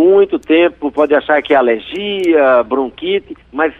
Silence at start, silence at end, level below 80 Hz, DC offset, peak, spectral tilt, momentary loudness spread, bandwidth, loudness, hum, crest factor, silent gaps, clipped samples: 0 s; 0.1 s; -50 dBFS; under 0.1%; -2 dBFS; -6 dB/octave; 8 LU; 7.6 kHz; -13 LUFS; none; 12 dB; none; under 0.1%